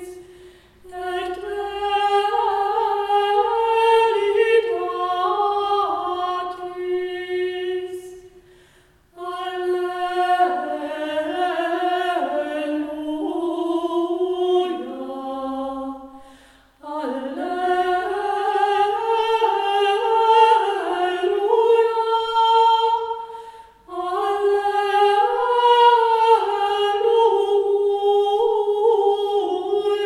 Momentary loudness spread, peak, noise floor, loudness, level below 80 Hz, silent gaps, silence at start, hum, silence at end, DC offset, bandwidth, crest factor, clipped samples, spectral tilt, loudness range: 12 LU; -4 dBFS; -55 dBFS; -20 LUFS; -60 dBFS; none; 0 s; none; 0 s; under 0.1%; 12.5 kHz; 18 dB; under 0.1%; -3 dB/octave; 9 LU